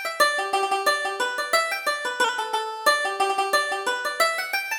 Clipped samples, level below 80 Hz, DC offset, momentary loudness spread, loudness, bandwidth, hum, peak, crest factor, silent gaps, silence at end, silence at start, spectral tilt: under 0.1%; -68 dBFS; under 0.1%; 5 LU; -23 LUFS; over 20 kHz; none; -6 dBFS; 18 dB; none; 0 s; 0 s; 1 dB/octave